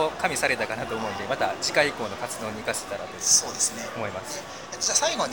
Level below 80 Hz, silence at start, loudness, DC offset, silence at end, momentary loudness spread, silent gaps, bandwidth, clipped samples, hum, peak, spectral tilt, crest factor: -58 dBFS; 0 s; -25 LUFS; 0.2%; 0 s; 13 LU; none; over 20 kHz; under 0.1%; none; -6 dBFS; -1 dB/octave; 20 dB